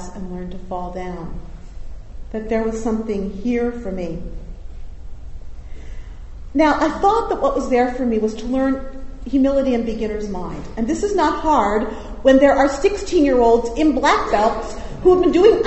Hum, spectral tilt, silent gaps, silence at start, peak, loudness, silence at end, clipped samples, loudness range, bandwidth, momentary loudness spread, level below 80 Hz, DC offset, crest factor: none; -5.5 dB/octave; none; 0 s; 0 dBFS; -18 LUFS; 0 s; under 0.1%; 10 LU; 8.2 kHz; 22 LU; -32 dBFS; under 0.1%; 18 dB